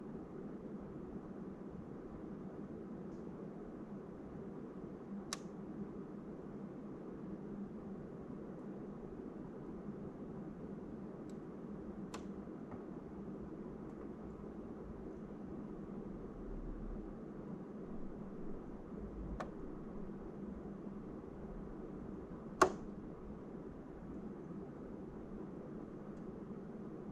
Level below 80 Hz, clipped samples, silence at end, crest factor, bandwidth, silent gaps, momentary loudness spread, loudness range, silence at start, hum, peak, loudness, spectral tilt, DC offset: -58 dBFS; under 0.1%; 0 s; 32 dB; 11.5 kHz; none; 2 LU; 7 LU; 0 s; none; -14 dBFS; -48 LUFS; -6 dB/octave; under 0.1%